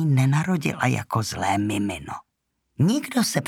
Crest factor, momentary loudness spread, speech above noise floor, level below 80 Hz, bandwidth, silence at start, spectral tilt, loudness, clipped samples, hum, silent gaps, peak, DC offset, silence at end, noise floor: 18 dB; 10 LU; 48 dB; -56 dBFS; 17 kHz; 0 s; -5.5 dB/octave; -23 LUFS; under 0.1%; none; none; -4 dBFS; under 0.1%; 0 s; -71 dBFS